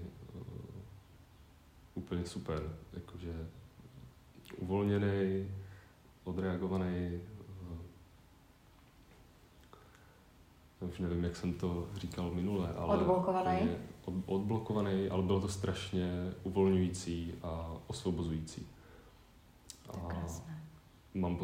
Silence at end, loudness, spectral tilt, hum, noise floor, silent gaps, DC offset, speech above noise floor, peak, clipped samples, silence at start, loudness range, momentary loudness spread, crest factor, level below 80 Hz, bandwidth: 0 s; -37 LUFS; -7 dB/octave; none; -62 dBFS; none; under 0.1%; 27 dB; -18 dBFS; under 0.1%; 0 s; 10 LU; 21 LU; 20 dB; -58 dBFS; 15.5 kHz